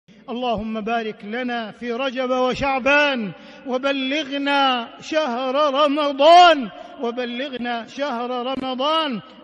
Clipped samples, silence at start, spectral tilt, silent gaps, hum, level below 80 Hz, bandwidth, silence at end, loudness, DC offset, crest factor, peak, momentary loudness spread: under 0.1%; 0.3 s; -4 dB/octave; none; none; -54 dBFS; 9.4 kHz; 0.1 s; -20 LUFS; under 0.1%; 16 dB; -4 dBFS; 12 LU